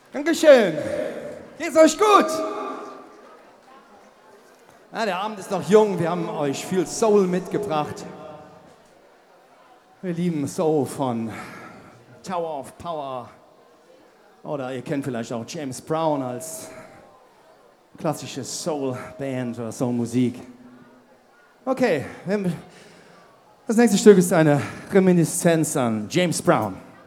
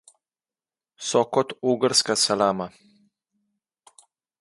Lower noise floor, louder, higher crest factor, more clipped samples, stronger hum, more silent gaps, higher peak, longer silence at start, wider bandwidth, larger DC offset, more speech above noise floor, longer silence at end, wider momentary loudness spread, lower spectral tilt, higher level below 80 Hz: second, -55 dBFS vs under -90 dBFS; about the same, -22 LUFS vs -22 LUFS; about the same, 22 dB vs 22 dB; neither; neither; neither; first, 0 dBFS vs -4 dBFS; second, 0.15 s vs 1 s; first, 16.5 kHz vs 11.5 kHz; neither; second, 33 dB vs over 67 dB; second, 0.15 s vs 1.7 s; first, 20 LU vs 12 LU; first, -5.5 dB/octave vs -3 dB/octave; about the same, -64 dBFS vs -68 dBFS